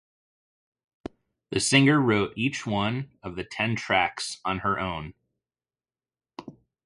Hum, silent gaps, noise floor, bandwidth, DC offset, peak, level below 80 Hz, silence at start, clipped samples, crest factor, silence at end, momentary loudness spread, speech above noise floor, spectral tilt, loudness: none; none; under -90 dBFS; 11.5 kHz; under 0.1%; -6 dBFS; -54 dBFS; 1.5 s; under 0.1%; 22 dB; 0.35 s; 24 LU; over 65 dB; -4.5 dB/octave; -25 LUFS